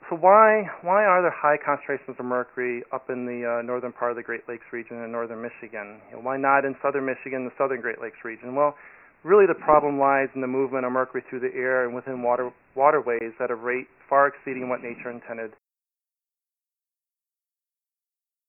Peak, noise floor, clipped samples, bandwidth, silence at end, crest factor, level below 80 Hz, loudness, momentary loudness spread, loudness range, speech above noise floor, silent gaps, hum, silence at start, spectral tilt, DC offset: -2 dBFS; under -90 dBFS; under 0.1%; 3 kHz; 3 s; 22 dB; -68 dBFS; -24 LUFS; 17 LU; 9 LU; over 66 dB; none; none; 0.05 s; -11 dB/octave; under 0.1%